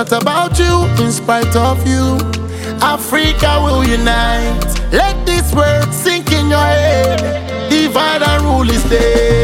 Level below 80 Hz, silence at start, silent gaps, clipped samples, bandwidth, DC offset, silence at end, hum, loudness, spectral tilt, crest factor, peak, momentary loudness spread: -20 dBFS; 0 s; none; under 0.1%; 17 kHz; under 0.1%; 0 s; none; -13 LUFS; -5 dB/octave; 12 dB; 0 dBFS; 5 LU